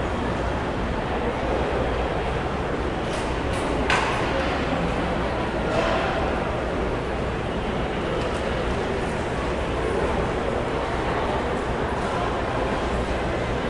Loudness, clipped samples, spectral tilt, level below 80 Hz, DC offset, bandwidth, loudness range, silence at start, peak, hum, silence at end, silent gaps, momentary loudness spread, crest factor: -25 LUFS; under 0.1%; -6 dB/octave; -34 dBFS; under 0.1%; 11.5 kHz; 2 LU; 0 s; -6 dBFS; none; 0 s; none; 3 LU; 18 dB